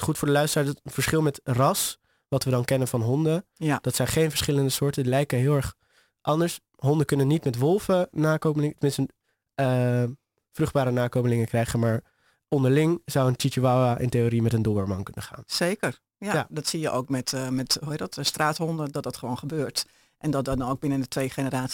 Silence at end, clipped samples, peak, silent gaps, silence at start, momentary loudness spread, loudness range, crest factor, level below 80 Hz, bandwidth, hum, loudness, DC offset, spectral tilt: 0 s; under 0.1%; -8 dBFS; none; 0 s; 8 LU; 4 LU; 16 dB; -52 dBFS; 17 kHz; none; -25 LUFS; under 0.1%; -5.5 dB/octave